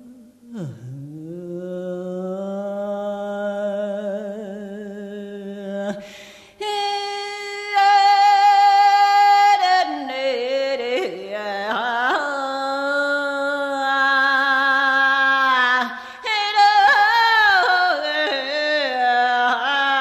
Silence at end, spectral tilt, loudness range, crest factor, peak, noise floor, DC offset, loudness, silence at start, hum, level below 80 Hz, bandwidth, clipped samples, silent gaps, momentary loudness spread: 0 s; -3 dB/octave; 13 LU; 14 dB; -6 dBFS; -45 dBFS; under 0.1%; -18 LUFS; 0.05 s; none; -66 dBFS; 13.5 kHz; under 0.1%; none; 19 LU